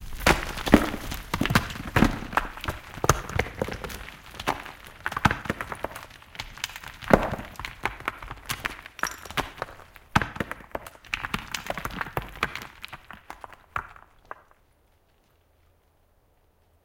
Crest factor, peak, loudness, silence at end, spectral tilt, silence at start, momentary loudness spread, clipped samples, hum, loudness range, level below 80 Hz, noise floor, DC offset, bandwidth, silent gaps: 30 dB; 0 dBFS; -28 LUFS; 2.9 s; -4.5 dB/octave; 0 s; 18 LU; under 0.1%; none; 13 LU; -40 dBFS; -64 dBFS; under 0.1%; 17 kHz; none